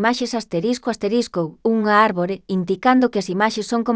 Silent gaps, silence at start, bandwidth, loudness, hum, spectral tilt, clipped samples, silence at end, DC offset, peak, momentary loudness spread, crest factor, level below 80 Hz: none; 0 s; 8 kHz; -19 LUFS; none; -5.5 dB/octave; under 0.1%; 0 s; under 0.1%; -2 dBFS; 7 LU; 18 dB; -60 dBFS